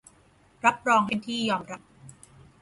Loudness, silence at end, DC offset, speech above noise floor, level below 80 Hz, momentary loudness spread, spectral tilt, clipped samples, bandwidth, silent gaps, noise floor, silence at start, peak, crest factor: -25 LUFS; 0.5 s; under 0.1%; 34 dB; -64 dBFS; 15 LU; -4 dB/octave; under 0.1%; 11.5 kHz; none; -60 dBFS; 0.65 s; -6 dBFS; 22 dB